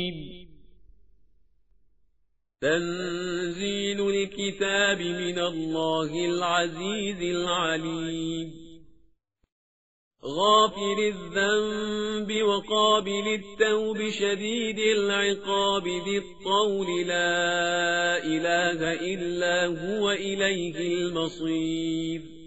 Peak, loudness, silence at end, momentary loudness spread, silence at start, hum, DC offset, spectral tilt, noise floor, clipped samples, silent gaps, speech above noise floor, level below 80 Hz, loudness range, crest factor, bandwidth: -8 dBFS; -26 LUFS; 0 s; 7 LU; 0 s; none; 0.3%; -2 dB/octave; -72 dBFS; under 0.1%; 9.52-10.11 s; 45 dB; -58 dBFS; 6 LU; 18 dB; 8 kHz